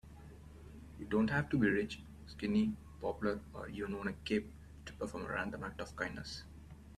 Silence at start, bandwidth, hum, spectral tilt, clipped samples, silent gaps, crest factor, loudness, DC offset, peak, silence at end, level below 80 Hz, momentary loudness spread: 0.05 s; 12.5 kHz; none; -6.5 dB/octave; under 0.1%; none; 20 dB; -38 LUFS; under 0.1%; -20 dBFS; 0 s; -56 dBFS; 21 LU